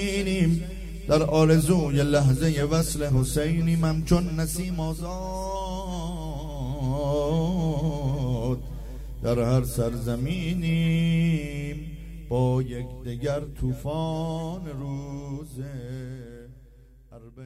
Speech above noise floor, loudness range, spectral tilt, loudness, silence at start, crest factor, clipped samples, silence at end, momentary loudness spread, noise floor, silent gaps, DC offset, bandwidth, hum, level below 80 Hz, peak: 26 dB; 9 LU; -6.5 dB/octave; -26 LUFS; 0 s; 20 dB; under 0.1%; 0 s; 14 LU; -51 dBFS; none; under 0.1%; 15.5 kHz; none; -36 dBFS; -6 dBFS